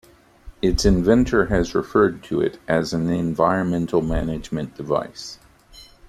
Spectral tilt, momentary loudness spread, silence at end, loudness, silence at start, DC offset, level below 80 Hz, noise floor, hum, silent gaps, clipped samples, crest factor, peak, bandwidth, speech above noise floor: -6 dB/octave; 11 LU; 0.25 s; -21 LUFS; 0.45 s; under 0.1%; -34 dBFS; -47 dBFS; none; none; under 0.1%; 18 dB; -2 dBFS; 14 kHz; 27 dB